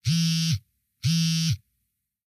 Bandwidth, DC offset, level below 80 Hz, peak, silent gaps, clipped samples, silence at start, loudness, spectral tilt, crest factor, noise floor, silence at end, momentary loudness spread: 15 kHz; under 0.1%; -58 dBFS; -12 dBFS; none; under 0.1%; 0.05 s; -25 LUFS; -3.5 dB/octave; 14 dB; -78 dBFS; 0.7 s; 8 LU